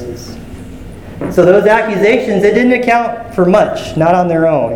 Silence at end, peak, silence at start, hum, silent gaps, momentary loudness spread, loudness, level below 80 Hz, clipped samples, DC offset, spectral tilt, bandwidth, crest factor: 0 s; 0 dBFS; 0 s; none; none; 21 LU; -11 LUFS; -38 dBFS; 0.4%; under 0.1%; -6.5 dB/octave; 17 kHz; 12 dB